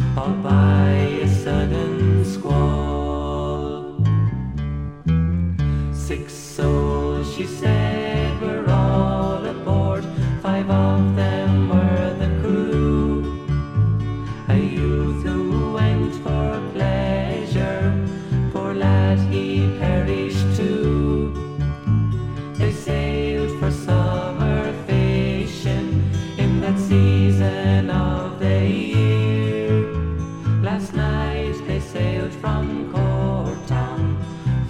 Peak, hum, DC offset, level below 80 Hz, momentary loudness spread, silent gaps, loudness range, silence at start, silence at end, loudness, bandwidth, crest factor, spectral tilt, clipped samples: -4 dBFS; none; under 0.1%; -30 dBFS; 7 LU; none; 3 LU; 0 s; 0 s; -21 LUFS; 10 kHz; 14 dB; -8 dB/octave; under 0.1%